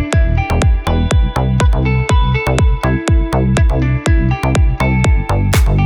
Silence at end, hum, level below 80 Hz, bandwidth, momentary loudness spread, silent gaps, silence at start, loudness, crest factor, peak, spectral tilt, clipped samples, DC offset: 0 s; none; -16 dBFS; 18.5 kHz; 2 LU; none; 0 s; -14 LUFS; 12 dB; 0 dBFS; -6.5 dB/octave; under 0.1%; under 0.1%